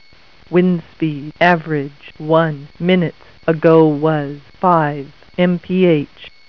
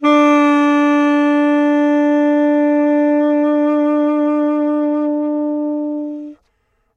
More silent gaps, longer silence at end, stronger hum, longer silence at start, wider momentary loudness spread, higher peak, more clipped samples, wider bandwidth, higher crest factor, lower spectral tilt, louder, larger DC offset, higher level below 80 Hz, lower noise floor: neither; second, 0.2 s vs 0.6 s; neither; first, 0.5 s vs 0 s; first, 13 LU vs 8 LU; first, 0 dBFS vs -4 dBFS; neither; second, 5.4 kHz vs 6.8 kHz; about the same, 16 dB vs 12 dB; first, -9 dB/octave vs -4.5 dB/octave; about the same, -16 LUFS vs -15 LUFS; first, 0.5% vs under 0.1%; first, -52 dBFS vs -70 dBFS; second, -48 dBFS vs -64 dBFS